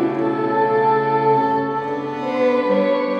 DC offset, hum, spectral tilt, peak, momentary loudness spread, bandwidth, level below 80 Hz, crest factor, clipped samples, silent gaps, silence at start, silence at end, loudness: under 0.1%; none; -8 dB/octave; -6 dBFS; 7 LU; 6.8 kHz; -66 dBFS; 12 dB; under 0.1%; none; 0 s; 0 s; -19 LUFS